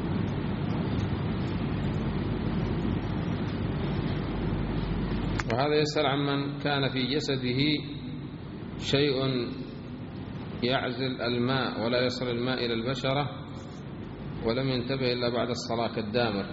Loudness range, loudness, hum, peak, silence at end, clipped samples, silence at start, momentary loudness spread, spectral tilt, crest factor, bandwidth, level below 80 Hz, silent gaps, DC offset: 3 LU; -29 LUFS; none; -10 dBFS; 0 s; under 0.1%; 0 s; 12 LU; -5 dB/octave; 18 dB; 7.6 kHz; -44 dBFS; none; under 0.1%